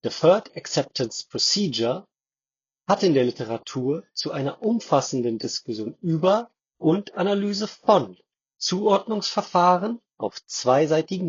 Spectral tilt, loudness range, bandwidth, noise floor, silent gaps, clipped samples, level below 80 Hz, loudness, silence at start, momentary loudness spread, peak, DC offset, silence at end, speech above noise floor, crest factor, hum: -4.5 dB/octave; 2 LU; 7.8 kHz; under -90 dBFS; none; under 0.1%; -70 dBFS; -23 LUFS; 0.05 s; 10 LU; -4 dBFS; under 0.1%; 0 s; over 67 dB; 20 dB; none